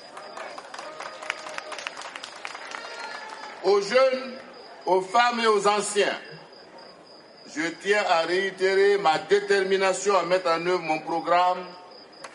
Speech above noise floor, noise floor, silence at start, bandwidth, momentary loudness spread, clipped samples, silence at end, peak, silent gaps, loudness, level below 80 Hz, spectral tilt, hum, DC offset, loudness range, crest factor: 26 dB; -49 dBFS; 0 s; 11.5 kHz; 17 LU; under 0.1%; 0 s; -8 dBFS; none; -24 LUFS; -78 dBFS; -3 dB/octave; none; under 0.1%; 8 LU; 18 dB